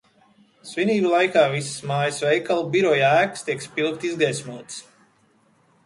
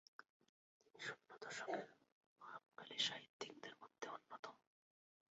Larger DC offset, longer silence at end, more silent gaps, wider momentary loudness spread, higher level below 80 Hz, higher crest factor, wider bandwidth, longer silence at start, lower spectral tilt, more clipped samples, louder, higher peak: neither; first, 1.05 s vs 0.75 s; second, none vs 0.30-0.40 s, 0.49-0.80 s, 2.12-2.36 s, 3.29-3.40 s, 4.39-4.43 s; about the same, 15 LU vs 17 LU; first, -68 dBFS vs under -90 dBFS; about the same, 20 dB vs 24 dB; first, 11.5 kHz vs 7.6 kHz; first, 0.65 s vs 0.2 s; first, -4.5 dB/octave vs 0.5 dB/octave; neither; first, -21 LUFS vs -50 LUFS; first, -4 dBFS vs -28 dBFS